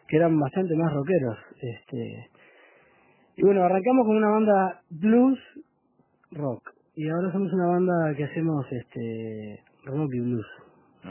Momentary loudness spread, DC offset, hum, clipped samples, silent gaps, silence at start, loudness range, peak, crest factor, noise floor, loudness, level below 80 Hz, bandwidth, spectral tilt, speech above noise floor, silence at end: 17 LU; under 0.1%; none; under 0.1%; none; 0.1 s; 5 LU; -8 dBFS; 18 dB; -66 dBFS; -25 LUFS; -66 dBFS; 3.2 kHz; -12 dB/octave; 42 dB; 0 s